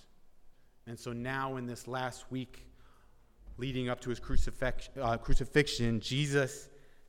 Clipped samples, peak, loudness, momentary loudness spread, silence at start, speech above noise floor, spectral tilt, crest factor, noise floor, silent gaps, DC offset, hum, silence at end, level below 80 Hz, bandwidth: under 0.1%; -12 dBFS; -35 LUFS; 14 LU; 0.25 s; 28 dB; -5 dB/octave; 22 dB; -60 dBFS; none; under 0.1%; none; 0.3 s; -40 dBFS; 13.5 kHz